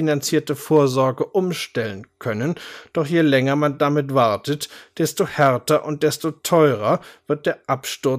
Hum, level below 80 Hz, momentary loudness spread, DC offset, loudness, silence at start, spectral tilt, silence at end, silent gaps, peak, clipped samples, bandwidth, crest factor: none; -64 dBFS; 10 LU; under 0.1%; -20 LUFS; 0 s; -5.5 dB/octave; 0 s; none; -4 dBFS; under 0.1%; 15.5 kHz; 16 dB